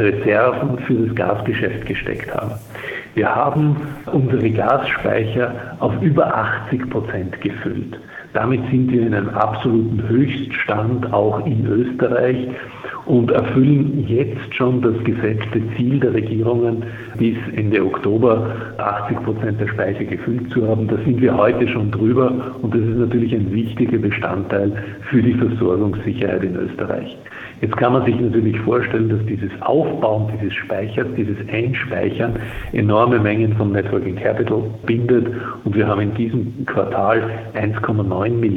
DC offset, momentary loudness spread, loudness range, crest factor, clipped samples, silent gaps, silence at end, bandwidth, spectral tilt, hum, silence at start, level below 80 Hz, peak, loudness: under 0.1%; 8 LU; 3 LU; 16 dB; under 0.1%; none; 0 s; 4.4 kHz; -9.5 dB/octave; none; 0 s; -46 dBFS; -2 dBFS; -18 LUFS